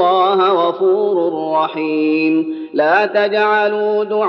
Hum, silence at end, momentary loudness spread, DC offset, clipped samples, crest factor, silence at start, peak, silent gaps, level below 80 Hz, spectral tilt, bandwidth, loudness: none; 0 s; 5 LU; under 0.1%; under 0.1%; 12 dB; 0 s; -2 dBFS; none; -72 dBFS; -7 dB/octave; 6 kHz; -15 LUFS